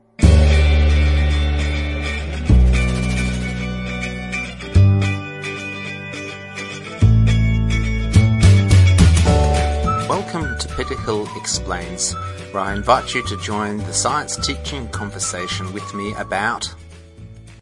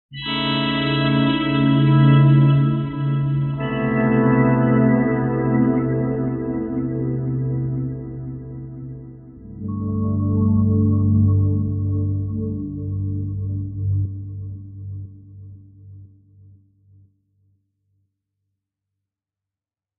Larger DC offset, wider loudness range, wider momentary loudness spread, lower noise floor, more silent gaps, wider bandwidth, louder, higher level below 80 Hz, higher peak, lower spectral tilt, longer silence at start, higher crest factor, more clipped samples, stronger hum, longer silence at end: neither; second, 7 LU vs 12 LU; second, 14 LU vs 18 LU; second, -39 dBFS vs -90 dBFS; neither; first, 11.5 kHz vs 4.2 kHz; about the same, -18 LUFS vs -19 LUFS; first, -22 dBFS vs -44 dBFS; first, 0 dBFS vs -4 dBFS; second, -5 dB/octave vs -6.5 dB/octave; about the same, 0.2 s vs 0.1 s; about the same, 16 dB vs 16 dB; neither; neither; second, 0.05 s vs 3.95 s